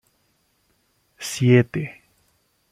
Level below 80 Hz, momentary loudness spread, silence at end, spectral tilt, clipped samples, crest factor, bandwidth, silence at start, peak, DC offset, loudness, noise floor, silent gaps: -60 dBFS; 17 LU; 0.8 s; -6.5 dB/octave; under 0.1%; 20 dB; 15.5 kHz; 1.2 s; -4 dBFS; under 0.1%; -20 LUFS; -67 dBFS; none